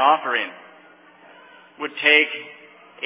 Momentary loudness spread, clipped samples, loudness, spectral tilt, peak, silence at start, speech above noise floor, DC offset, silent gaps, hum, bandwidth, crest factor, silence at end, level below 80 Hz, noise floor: 18 LU; under 0.1%; -18 LUFS; -4.5 dB/octave; -2 dBFS; 0 s; 30 dB; under 0.1%; none; none; 3.9 kHz; 22 dB; 0 s; under -90 dBFS; -50 dBFS